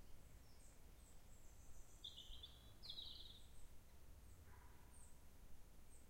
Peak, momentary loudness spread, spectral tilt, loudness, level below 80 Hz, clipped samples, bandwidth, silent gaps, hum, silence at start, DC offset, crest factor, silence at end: -40 dBFS; 13 LU; -3 dB/octave; -62 LUFS; -64 dBFS; under 0.1%; 16 kHz; none; none; 0 s; under 0.1%; 18 dB; 0 s